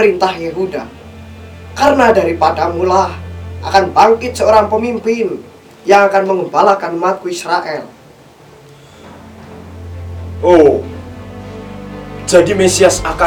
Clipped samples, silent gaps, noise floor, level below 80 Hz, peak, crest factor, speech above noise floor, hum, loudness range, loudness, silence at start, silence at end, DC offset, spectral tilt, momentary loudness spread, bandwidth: 0.2%; none; -41 dBFS; -38 dBFS; 0 dBFS; 14 dB; 29 dB; none; 6 LU; -12 LUFS; 0 s; 0 s; under 0.1%; -4.5 dB/octave; 21 LU; 19 kHz